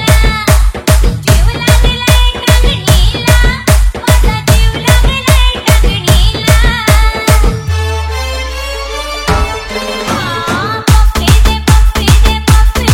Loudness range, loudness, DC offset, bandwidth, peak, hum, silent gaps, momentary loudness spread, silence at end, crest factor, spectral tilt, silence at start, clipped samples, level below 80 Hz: 4 LU; -10 LUFS; under 0.1%; 17 kHz; 0 dBFS; none; none; 7 LU; 0 s; 8 dB; -4.5 dB/octave; 0 s; 2%; -10 dBFS